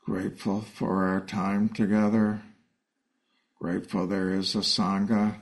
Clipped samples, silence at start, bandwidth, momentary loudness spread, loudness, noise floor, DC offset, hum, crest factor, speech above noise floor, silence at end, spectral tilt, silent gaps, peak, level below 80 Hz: under 0.1%; 0.05 s; 11.5 kHz; 8 LU; -27 LUFS; -78 dBFS; under 0.1%; none; 16 dB; 52 dB; 0 s; -5.5 dB/octave; none; -12 dBFS; -62 dBFS